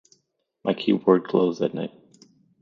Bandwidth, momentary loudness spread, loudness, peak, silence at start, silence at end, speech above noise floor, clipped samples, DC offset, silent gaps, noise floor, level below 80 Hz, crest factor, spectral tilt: 7.4 kHz; 13 LU; -23 LUFS; -4 dBFS; 0.65 s; 0.75 s; 50 dB; under 0.1%; under 0.1%; none; -72 dBFS; -70 dBFS; 20 dB; -7.5 dB/octave